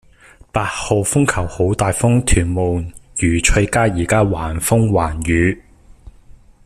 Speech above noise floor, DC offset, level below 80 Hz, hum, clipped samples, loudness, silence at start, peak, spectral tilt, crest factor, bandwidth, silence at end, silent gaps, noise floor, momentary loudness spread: 30 dB; under 0.1%; -28 dBFS; none; under 0.1%; -17 LUFS; 0.55 s; 0 dBFS; -5 dB/octave; 16 dB; 14.5 kHz; 0.55 s; none; -46 dBFS; 6 LU